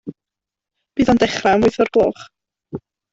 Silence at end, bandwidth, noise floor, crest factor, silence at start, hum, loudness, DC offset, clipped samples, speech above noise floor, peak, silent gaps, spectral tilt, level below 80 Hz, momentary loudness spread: 0.35 s; 8 kHz; -86 dBFS; 16 dB; 0.05 s; none; -16 LUFS; under 0.1%; under 0.1%; 71 dB; -2 dBFS; none; -5.5 dB/octave; -46 dBFS; 19 LU